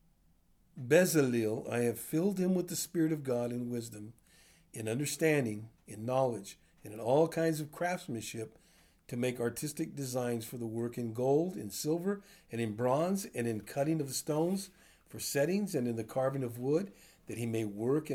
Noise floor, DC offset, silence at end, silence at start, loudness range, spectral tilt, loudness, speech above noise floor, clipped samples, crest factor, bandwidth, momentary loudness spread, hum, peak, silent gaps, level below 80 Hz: -68 dBFS; under 0.1%; 0 s; 0.75 s; 4 LU; -5.5 dB/octave; -34 LUFS; 35 dB; under 0.1%; 20 dB; over 20 kHz; 14 LU; none; -14 dBFS; none; -70 dBFS